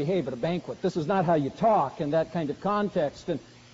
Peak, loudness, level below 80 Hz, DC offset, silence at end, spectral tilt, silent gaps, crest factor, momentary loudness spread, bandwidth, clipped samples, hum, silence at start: -12 dBFS; -27 LUFS; -60 dBFS; under 0.1%; 0.3 s; -6 dB/octave; none; 14 dB; 7 LU; 7.6 kHz; under 0.1%; none; 0 s